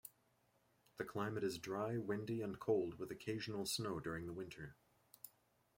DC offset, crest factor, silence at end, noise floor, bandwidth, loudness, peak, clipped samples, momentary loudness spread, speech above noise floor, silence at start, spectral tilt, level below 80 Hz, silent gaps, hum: under 0.1%; 20 dB; 0.5 s; -78 dBFS; 16.5 kHz; -44 LUFS; -26 dBFS; under 0.1%; 19 LU; 35 dB; 0.05 s; -5 dB/octave; -74 dBFS; none; none